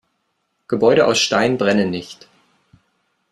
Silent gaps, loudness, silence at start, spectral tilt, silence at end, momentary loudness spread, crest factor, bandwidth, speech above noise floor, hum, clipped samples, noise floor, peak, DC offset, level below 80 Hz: none; -17 LUFS; 0.7 s; -4 dB/octave; 1.2 s; 13 LU; 18 dB; 12.5 kHz; 54 dB; none; under 0.1%; -70 dBFS; -2 dBFS; under 0.1%; -58 dBFS